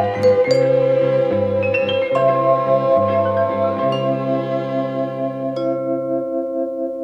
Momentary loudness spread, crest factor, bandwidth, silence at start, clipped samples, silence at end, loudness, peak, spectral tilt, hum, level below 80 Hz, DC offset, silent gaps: 8 LU; 14 dB; 7.8 kHz; 0 s; under 0.1%; 0 s; -18 LUFS; -4 dBFS; -7.5 dB/octave; none; -60 dBFS; under 0.1%; none